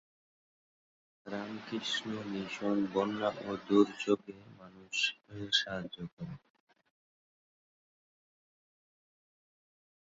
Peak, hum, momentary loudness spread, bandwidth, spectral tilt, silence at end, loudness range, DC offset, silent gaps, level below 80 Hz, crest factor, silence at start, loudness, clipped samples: -12 dBFS; none; 16 LU; 7.6 kHz; -3 dB/octave; 3.8 s; 6 LU; under 0.1%; 6.13-6.17 s; -72 dBFS; 26 dB; 1.25 s; -34 LUFS; under 0.1%